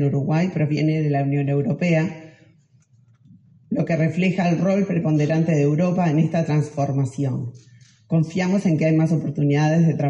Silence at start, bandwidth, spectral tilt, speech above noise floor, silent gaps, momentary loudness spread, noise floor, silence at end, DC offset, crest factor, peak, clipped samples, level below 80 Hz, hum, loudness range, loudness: 0 s; 8.2 kHz; -8 dB/octave; 37 dB; none; 6 LU; -56 dBFS; 0 s; under 0.1%; 12 dB; -8 dBFS; under 0.1%; -62 dBFS; none; 4 LU; -21 LUFS